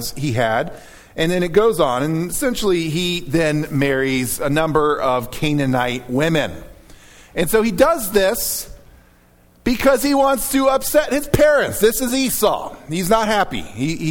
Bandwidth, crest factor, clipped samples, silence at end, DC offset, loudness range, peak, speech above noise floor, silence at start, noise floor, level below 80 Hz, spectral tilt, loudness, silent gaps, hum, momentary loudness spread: 19 kHz; 18 dB; under 0.1%; 0 s; under 0.1%; 3 LU; 0 dBFS; 34 dB; 0 s; -51 dBFS; -38 dBFS; -4.5 dB/octave; -18 LUFS; none; none; 8 LU